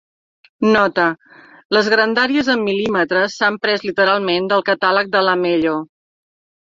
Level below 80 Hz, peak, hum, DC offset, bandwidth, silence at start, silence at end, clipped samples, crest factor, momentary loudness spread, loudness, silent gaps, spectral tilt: -58 dBFS; 0 dBFS; none; under 0.1%; 7.6 kHz; 0.6 s; 0.8 s; under 0.1%; 16 dB; 5 LU; -16 LUFS; 1.65-1.70 s; -5 dB/octave